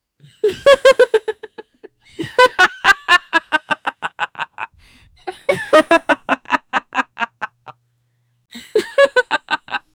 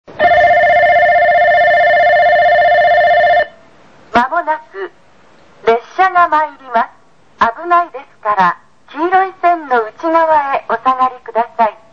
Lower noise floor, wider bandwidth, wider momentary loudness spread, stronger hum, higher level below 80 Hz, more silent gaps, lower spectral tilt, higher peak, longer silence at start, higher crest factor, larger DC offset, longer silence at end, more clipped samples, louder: first, -64 dBFS vs -48 dBFS; first, over 20 kHz vs 6.8 kHz; first, 17 LU vs 11 LU; neither; second, -54 dBFS vs -48 dBFS; neither; second, -2.5 dB/octave vs -5 dB/octave; about the same, 0 dBFS vs 0 dBFS; first, 0.45 s vs 0.1 s; first, 18 dB vs 12 dB; second, under 0.1% vs 0.4%; about the same, 0.2 s vs 0.2 s; neither; second, -16 LUFS vs -12 LUFS